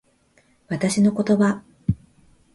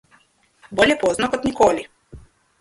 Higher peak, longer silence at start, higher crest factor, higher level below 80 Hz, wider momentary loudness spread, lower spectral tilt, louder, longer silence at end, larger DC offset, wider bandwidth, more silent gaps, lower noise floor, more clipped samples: second, -8 dBFS vs 0 dBFS; about the same, 0.7 s vs 0.7 s; about the same, 16 dB vs 20 dB; about the same, -48 dBFS vs -48 dBFS; about the same, 11 LU vs 12 LU; first, -6 dB/octave vs -4 dB/octave; second, -22 LUFS vs -19 LUFS; first, 0.6 s vs 0.4 s; neither; about the same, 11.5 kHz vs 11.5 kHz; neither; about the same, -60 dBFS vs -58 dBFS; neither